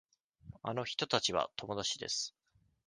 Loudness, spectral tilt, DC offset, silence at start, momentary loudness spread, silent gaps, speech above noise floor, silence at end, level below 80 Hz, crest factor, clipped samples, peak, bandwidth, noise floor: -36 LUFS; -2.5 dB/octave; under 0.1%; 0.45 s; 9 LU; none; 19 dB; 0.55 s; -68 dBFS; 28 dB; under 0.1%; -12 dBFS; 10.5 kHz; -56 dBFS